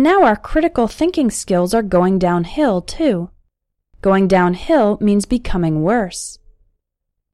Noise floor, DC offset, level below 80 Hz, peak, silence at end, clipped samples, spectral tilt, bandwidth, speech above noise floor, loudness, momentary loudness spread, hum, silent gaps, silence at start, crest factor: -76 dBFS; under 0.1%; -34 dBFS; -2 dBFS; 1 s; under 0.1%; -6 dB/octave; 13.5 kHz; 61 dB; -16 LUFS; 7 LU; none; none; 0 s; 14 dB